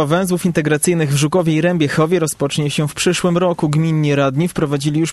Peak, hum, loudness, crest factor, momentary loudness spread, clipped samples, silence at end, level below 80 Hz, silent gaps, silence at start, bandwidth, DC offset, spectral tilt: -2 dBFS; none; -16 LUFS; 14 dB; 3 LU; under 0.1%; 0 s; -48 dBFS; none; 0 s; 13 kHz; under 0.1%; -5.5 dB/octave